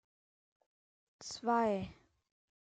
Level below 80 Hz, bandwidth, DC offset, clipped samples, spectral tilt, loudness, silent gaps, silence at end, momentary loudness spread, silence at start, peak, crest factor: -70 dBFS; 9.2 kHz; under 0.1%; under 0.1%; -5 dB/octave; -35 LUFS; none; 0.7 s; 17 LU; 1.2 s; -20 dBFS; 20 dB